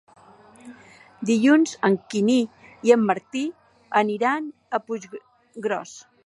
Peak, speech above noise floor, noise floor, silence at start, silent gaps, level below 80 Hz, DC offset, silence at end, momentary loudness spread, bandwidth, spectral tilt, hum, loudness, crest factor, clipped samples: -4 dBFS; 29 dB; -50 dBFS; 0.65 s; none; -74 dBFS; under 0.1%; 0.25 s; 14 LU; 11 kHz; -5 dB/octave; none; -23 LUFS; 20 dB; under 0.1%